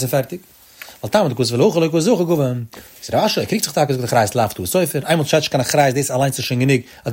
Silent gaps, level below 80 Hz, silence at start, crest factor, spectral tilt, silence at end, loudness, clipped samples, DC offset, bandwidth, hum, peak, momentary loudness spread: none; -54 dBFS; 0 s; 16 dB; -5 dB/octave; 0 s; -17 LUFS; under 0.1%; under 0.1%; 16.5 kHz; none; 0 dBFS; 13 LU